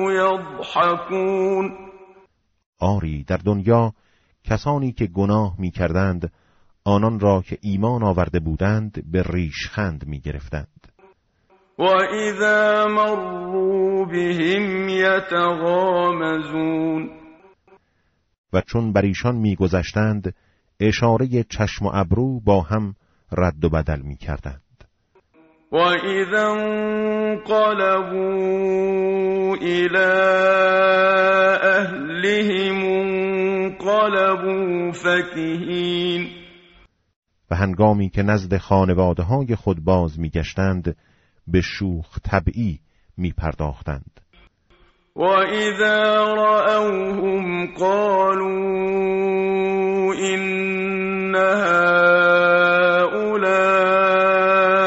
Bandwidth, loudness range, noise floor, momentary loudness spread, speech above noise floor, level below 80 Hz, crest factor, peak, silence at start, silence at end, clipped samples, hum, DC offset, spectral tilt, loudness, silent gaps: 8 kHz; 7 LU; -66 dBFS; 11 LU; 47 dB; -40 dBFS; 16 dB; -2 dBFS; 0 s; 0 s; under 0.1%; none; under 0.1%; -4.5 dB/octave; -19 LUFS; 2.66-2.73 s, 18.38-18.44 s, 37.16-37.22 s